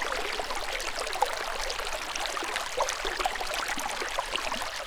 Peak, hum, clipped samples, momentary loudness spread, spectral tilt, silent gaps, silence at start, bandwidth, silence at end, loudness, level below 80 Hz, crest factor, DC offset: -8 dBFS; none; under 0.1%; 2 LU; -0.5 dB/octave; none; 0 s; over 20 kHz; 0 s; -31 LUFS; -44 dBFS; 22 dB; under 0.1%